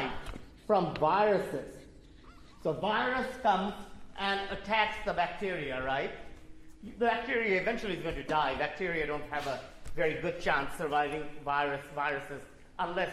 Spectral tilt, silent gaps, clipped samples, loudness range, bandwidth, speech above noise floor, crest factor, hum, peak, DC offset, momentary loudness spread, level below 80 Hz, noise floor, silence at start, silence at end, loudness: -5 dB/octave; none; under 0.1%; 2 LU; 14.5 kHz; 21 dB; 20 dB; none; -12 dBFS; under 0.1%; 16 LU; -52 dBFS; -53 dBFS; 0 s; 0 s; -32 LUFS